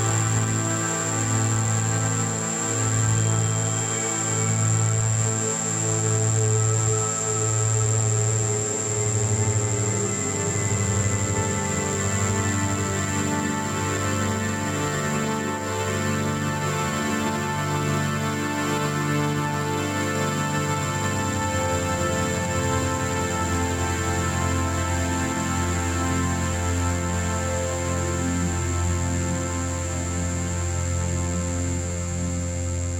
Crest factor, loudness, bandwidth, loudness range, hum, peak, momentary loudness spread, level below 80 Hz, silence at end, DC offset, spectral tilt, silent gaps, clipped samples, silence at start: 12 dB; -24 LUFS; 17 kHz; 3 LU; none; -10 dBFS; 4 LU; -42 dBFS; 0 s; under 0.1%; -4.5 dB/octave; none; under 0.1%; 0 s